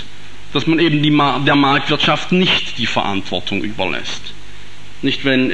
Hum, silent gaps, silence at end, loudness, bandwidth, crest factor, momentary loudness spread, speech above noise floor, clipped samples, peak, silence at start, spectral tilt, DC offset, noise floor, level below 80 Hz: 50 Hz at -45 dBFS; none; 0 s; -16 LUFS; 10 kHz; 16 dB; 10 LU; 23 dB; under 0.1%; -2 dBFS; 0 s; -5.5 dB/octave; 7%; -39 dBFS; -46 dBFS